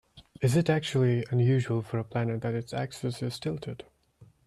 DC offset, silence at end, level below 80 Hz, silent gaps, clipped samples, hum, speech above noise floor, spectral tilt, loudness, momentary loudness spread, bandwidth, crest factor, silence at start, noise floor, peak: under 0.1%; 0.25 s; -62 dBFS; none; under 0.1%; none; 31 dB; -7 dB/octave; -29 LUFS; 9 LU; 12.5 kHz; 16 dB; 0.15 s; -59 dBFS; -12 dBFS